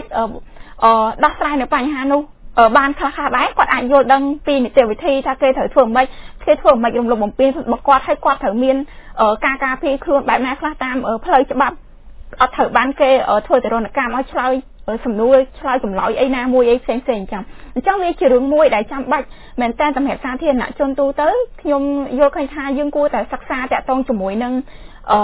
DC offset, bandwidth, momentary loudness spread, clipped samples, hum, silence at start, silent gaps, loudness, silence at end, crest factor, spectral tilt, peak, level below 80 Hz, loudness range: under 0.1%; 4 kHz; 9 LU; under 0.1%; none; 0 s; none; -16 LUFS; 0 s; 16 dB; -8.5 dB/octave; 0 dBFS; -40 dBFS; 3 LU